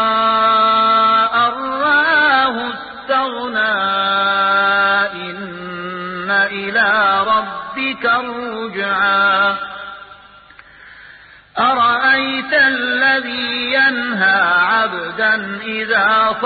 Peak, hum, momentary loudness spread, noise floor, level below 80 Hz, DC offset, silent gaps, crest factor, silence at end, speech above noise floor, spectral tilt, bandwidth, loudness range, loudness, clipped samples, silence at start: -2 dBFS; none; 13 LU; -42 dBFS; -54 dBFS; under 0.1%; none; 14 dB; 0 s; 26 dB; -8.5 dB/octave; 4.8 kHz; 4 LU; -14 LUFS; under 0.1%; 0 s